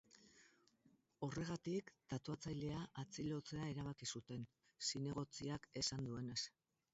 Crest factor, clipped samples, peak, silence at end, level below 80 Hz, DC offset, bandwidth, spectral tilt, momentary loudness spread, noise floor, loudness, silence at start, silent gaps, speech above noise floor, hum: 20 dB; under 0.1%; -28 dBFS; 0.45 s; -70 dBFS; under 0.1%; 8 kHz; -5 dB/octave; 8 LU; -77 dBFS; -47 LUFS; 0.15 s; none; 30 dB; none